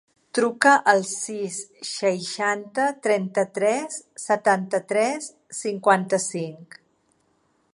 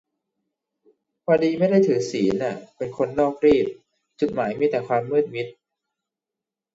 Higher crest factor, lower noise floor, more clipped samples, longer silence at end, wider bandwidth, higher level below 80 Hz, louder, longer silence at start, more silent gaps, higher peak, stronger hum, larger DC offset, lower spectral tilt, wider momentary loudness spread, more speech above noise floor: about the same, 22 dB vs 18 dB; second, -67 dBFS vs -88 dBFS; neither; second, 1.1 s vs 1.25 s; first, 11.5 kHz vs 8 kHz; second, -78 dBFS vs -58 dBFS; about the same, -23 LUFS vs -22 LUFS; second, 0.35 s vs 1.3 s; neither; first, -2 dBFS vs -6 dBFS; neither; neither; second, -3.5 dB/octave vs -6.5 dB/octave; about the same, 14 LU vs 12 LU; second, 44 dB vs 67 dB